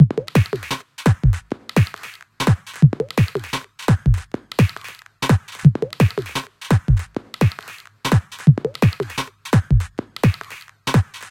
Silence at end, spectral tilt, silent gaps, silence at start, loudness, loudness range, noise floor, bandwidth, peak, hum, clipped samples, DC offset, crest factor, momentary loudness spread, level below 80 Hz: 0.05 s; -6.5 dB/octave; none; 0 s; -20 LUFS; 1 LU; -40 dBFS; 16.5 kHz; 0 dBFS; none; under 0.1%; under 0.1%; 18 dB; 12 LU; -32 dBFS